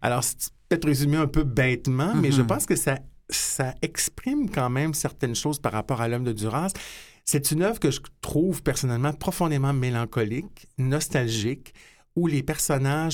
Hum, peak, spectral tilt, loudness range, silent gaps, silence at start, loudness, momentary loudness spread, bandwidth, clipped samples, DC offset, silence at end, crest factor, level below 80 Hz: none; -6 dBFS; -5 dB/octave; 3 LU; none; 0 s; -25 LUFS; 7 LU; 18.5 kHz; under 0.1%; under 0.1%; 0 s; 18 dB; -44 dBFS